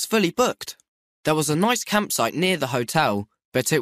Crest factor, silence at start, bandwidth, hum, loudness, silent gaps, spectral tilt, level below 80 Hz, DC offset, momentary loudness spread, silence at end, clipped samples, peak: 16 dB; 0 s; 15.5 kHz; none; -22 LUFS; 0.88-1.24 s, 3.45-3.52 s; -4 dB/octave; -60 dBFS; under 0.1%; 9 LU; 0 s; under 0.1%; -6 dBFS